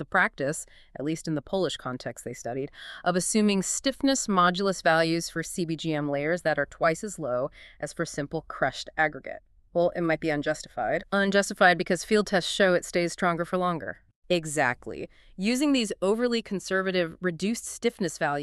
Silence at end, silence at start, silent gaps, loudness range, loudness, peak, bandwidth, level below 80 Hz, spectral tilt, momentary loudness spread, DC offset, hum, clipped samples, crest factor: 0 s; 0 s; 14.16-14.22 s; 5 LU; -27 LUFS; -8 dBFS; 13.5 kHz; -56 dBFS; -4 dB/octave; 12 LU; under 0.1%; none; under 0.1%; 20 dB